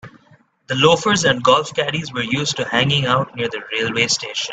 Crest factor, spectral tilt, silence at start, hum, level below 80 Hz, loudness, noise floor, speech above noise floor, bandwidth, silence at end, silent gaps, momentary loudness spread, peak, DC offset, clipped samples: 18 dB; -3.5 dB/octave; 0.05 s; none; -54 dBFS; -17 LUFS; -53 dBFS; 35 dB; 9.2 kHz; 0 s; none; 8 LU; 0 dBFS; under 0.1%; under 0.1%